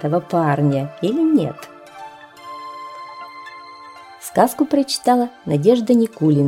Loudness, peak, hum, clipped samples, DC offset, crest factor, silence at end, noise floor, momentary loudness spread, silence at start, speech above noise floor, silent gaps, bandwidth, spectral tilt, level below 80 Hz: -18 LUFS; -2 dBFS; none; under 0.1%; under 0.1%; 18 dB; 0 s; -39 dBFS; 22 LU; 0 s; 23 dB; none; 16.5 kHz; -6.5 dB/octave; -62 dBFS